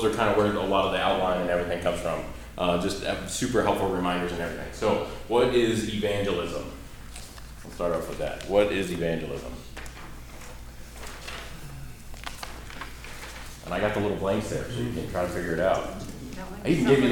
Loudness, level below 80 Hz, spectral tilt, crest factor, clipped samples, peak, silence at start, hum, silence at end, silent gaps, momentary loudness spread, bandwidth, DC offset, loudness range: -27 LUFS; -42 dBFS; -5 dB/octave; 20 dB; under 0.1%; -8 dBFS; 0 s; none; 0 s; none; 18 LU; 19 kHz; under 0.1%; 14 LU